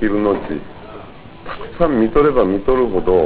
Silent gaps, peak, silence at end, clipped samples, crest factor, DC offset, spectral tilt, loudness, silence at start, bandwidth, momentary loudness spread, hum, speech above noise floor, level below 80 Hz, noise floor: none; 0 dBFS; 0 s; under 0.1%; 16 dB; 0.8%; -11 dB/octave; -16 LUFS; 0 s; 4 kHz; 22 LU; none; 21 dB; -34 dBFS; -37 dBFS